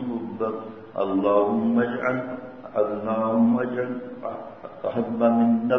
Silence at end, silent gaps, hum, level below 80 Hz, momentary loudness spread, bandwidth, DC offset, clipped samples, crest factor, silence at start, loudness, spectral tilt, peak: 0 s; none; none; -66 dBFS; 14 LU; 3.9 kHz; 0.2%; under 0.1%; 16 dB; 0 s; -24 LUFS; -9.5 dB/octave; -8 dBFS